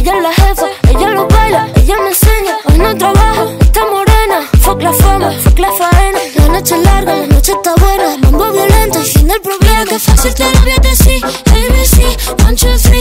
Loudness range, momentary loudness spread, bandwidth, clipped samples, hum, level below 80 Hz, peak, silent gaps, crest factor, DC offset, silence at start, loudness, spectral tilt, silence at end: 1 LU; 2 LU; 16.5 kHz; 3%; none; -10 dBFS; 0 dBFS; none; 8 dB; under 0.1%; 0 s; -9 LUFS; -4.5 dB/octave; 0 s